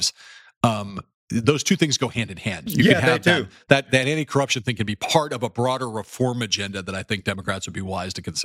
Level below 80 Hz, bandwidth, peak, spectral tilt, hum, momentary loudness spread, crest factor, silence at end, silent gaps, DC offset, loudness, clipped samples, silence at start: -54 dBFS; 16.5 kHz; 0 dBFS; -4 dB/octave; none; 11 LU; 22 dB; 0 s; 0.57-0.61 s, 1.14-1.28 s; under 0.1%; -22 LUFS; under 0.1%; 0 s